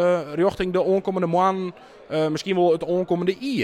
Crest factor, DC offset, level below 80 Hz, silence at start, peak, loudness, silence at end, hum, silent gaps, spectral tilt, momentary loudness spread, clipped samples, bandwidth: 14 dB; under 0.1%; -52 dBFS; 0 s; -8 dBFS; -22 LUFS; 0 s; none; none; -6.5 dB/octave; 5 LU; under 0.1%; 12 kHz